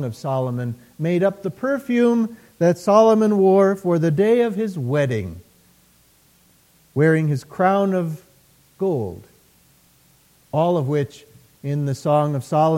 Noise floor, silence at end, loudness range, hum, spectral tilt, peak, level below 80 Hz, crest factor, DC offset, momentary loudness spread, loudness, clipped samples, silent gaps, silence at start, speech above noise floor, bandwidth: -56 dBFS; 0 s; 8 LU; none; -8 dB/octave; -2 dBFS; -60 dBFS; 18 dB; under 0.1%; 12 LU; -20 LUFS; under 0.1%; none; 0 s; 37 dB; 16.5 kHz